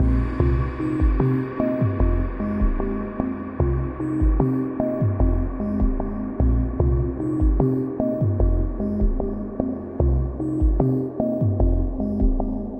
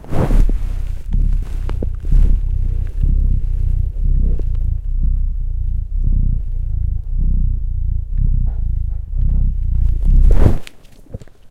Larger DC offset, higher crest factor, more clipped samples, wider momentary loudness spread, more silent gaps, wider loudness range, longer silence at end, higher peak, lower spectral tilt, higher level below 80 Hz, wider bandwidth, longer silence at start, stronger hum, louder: neither; about the same, 16 dB vs 14 dB; neither; about the same, 6 LU vs 7 LU; neither; about the same, 1 LU vs 3 LU; about the same, 0 s vs 0 s; second, -4 dBFS vs 0 dBFS; first, -11.5 dB/octave vs -9 dB/octave; second, -24 dBFS vs -16 dBFS; about the same, 3.3 kHz vs 3 kHz; about the same, 0 s vs 0.05 s; neither; about the same, -23 LUFS vs -21 LUFS